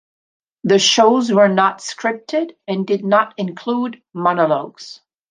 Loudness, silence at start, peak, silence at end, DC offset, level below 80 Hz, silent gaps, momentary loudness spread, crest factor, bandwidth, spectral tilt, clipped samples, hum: -17 LUFS; 0.65 s; -2 dBFS; 0.4 s; under 0.1%; -70 dBFS; none; 13 LU; 16 dB; 10 kHz; -4 dB/octave; under 0.1%; none